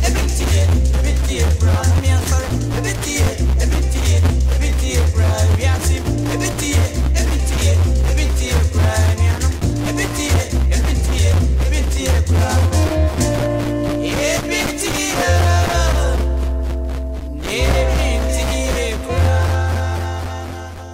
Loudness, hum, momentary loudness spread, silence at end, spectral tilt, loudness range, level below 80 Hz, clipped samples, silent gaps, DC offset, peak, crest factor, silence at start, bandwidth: -17 LUFS; none; 5 LU; 0 s; -5 dB/octave; 2 LU; -18 dBFS; under 0.1%; none; under 0.1%; -2 dBFS; 14 dB; 0 s; 16 kHz